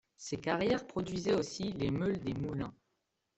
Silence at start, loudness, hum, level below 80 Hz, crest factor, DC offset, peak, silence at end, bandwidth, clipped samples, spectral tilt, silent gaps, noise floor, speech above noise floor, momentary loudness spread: 0.2 s; -35 LUFS; none; -60 dBFS; 18 dB; under 0.1%; -18 dBFS; 0.65 s; 8.2 kHz; under 0.1%; -6 dB/octave; none; -83 dBFS; 48 dB; 8 LU